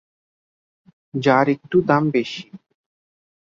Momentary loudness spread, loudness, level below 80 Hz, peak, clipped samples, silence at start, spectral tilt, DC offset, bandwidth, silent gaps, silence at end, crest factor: 14 LU; -19 LUFS; -62 dBFS; -2 dBFS; under 0.1%; 1.15 s; -7 dB/octave; under 0.1%; 7.4 kHz; none; 0.95 s; 20 dB